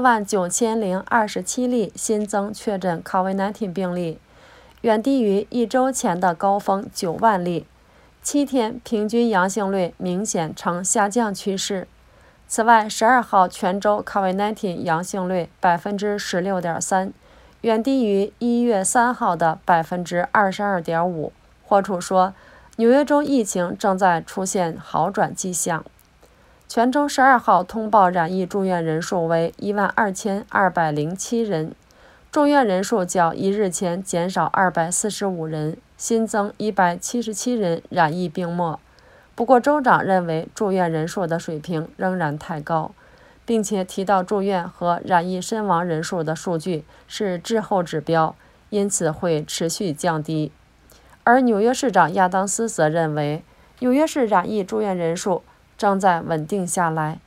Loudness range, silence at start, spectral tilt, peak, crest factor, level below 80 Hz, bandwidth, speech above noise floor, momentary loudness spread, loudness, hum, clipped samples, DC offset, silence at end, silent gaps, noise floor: 4 LU; 0 s; -4.5 dB/octave; 0 dBFS; 20 dB; -56 dBFS; 16 kHz; 33 dB; 9 LU; -21 LUFS; none; under 0.1%; under 0.1%; 0.1 s; none; -53 dBFS